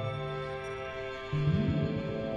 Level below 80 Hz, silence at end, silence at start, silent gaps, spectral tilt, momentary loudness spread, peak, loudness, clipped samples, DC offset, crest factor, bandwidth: -50 dBFS; 0 s; 0 s; none; -8 dB/octave; 9 LU; -18 dBFS; -33 LUFS; under 0.1%; under 0.1%; 16 dB; 7.2 kHz